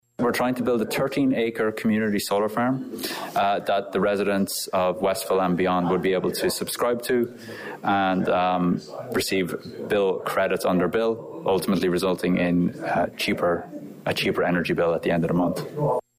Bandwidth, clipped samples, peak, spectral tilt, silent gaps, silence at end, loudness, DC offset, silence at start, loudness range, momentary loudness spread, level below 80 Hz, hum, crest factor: 16 kHz; under 0.1%; -14 dBFS; -5.5 dB/octave; none; 0.2 s; -24 LUFS; under 0.1%; 0.2 s; 1 LU; 5 LU; -56 dBFS; none; 10 dB